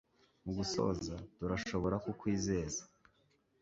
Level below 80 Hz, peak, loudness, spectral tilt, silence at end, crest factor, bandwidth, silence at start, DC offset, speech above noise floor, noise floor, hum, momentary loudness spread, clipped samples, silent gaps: -56 dBFS; -20 dBFS; -38 LUFS; -6 dB/octave; 0.75 s; 18 dB; 7.6 kHz; 0.45 s; under 0.1%; 37 dB; -74 dBFS; none; 8 LU; under 0.1%; none